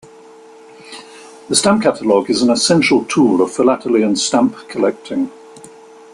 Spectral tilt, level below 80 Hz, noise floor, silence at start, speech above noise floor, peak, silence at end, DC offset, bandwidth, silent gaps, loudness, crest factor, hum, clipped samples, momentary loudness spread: -4 dB/octave; -56 dBFS; -41 dBFS; 0.85 s; 26 dB; 0 dBFS; 0.45 s; under 0.1%; 12.5 kHz; none; -15 LUFS; 16 dB; none; under 0.1%; 12 LU